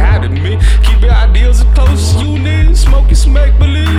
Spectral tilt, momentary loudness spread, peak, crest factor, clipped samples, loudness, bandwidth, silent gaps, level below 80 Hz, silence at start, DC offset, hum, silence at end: -5.5 dB/octave; 3 LU; 0 dBFS; 6 dB; under 0.1%; -10 LUFS; 11 kHz; none; -8 dBFS; 0 s; under 0.1%; none; 0 s